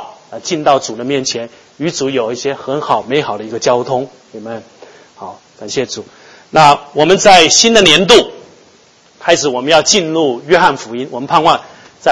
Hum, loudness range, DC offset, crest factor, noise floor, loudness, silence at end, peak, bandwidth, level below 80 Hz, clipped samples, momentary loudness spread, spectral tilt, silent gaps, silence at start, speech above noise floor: none; 10 LU; under 0.1%; 12 dB; -47 dBFS; -11 LUFS; 0 s; 0 dBFS; 11 kHz; -46 dBFS; 0.8%; 21 LU; -2.5 dB/octave; none; 0 s; 35 dB